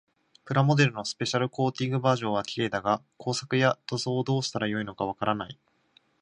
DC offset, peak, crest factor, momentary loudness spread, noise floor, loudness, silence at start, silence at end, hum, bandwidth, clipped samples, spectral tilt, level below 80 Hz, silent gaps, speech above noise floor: under 0.1%; -8 dBFS; 20 dB; 7 LU; -65 dBFS; -27 LUFS; 0.45 s; 0.7 s; none; 10.5 kHz; under 0.1%; -5.5 dB/octave; -64 dBFS; none; 38 dB